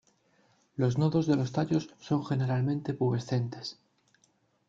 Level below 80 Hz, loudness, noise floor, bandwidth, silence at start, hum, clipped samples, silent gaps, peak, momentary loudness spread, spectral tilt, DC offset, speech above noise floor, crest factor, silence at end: -66 dBFS; -30 LUFS; -70 dBFS; 7.6 kHz; 0.8 s; none; under 0.1%; none; -14 dBFS; 9 LU; -7.5 dB/octave; under 0.1%; 41 dB; 18 dB; 0.95 s